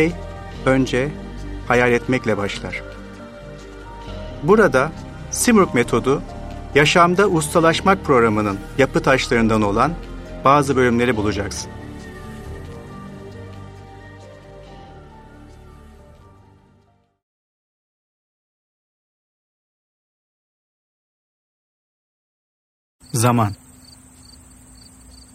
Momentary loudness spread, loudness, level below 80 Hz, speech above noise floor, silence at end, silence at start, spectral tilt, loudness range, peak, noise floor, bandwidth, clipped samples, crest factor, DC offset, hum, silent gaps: 22 LU; -17 LUFS; -40 dBFS; 41 dB; 1.8 s; 0 s; -5 dB/octave; 20 LU; 0 dBFS; -58 dBFS; 16 kHz; under 0.1%; 20 dB; under 0.1%; none; 17.22-22.99 s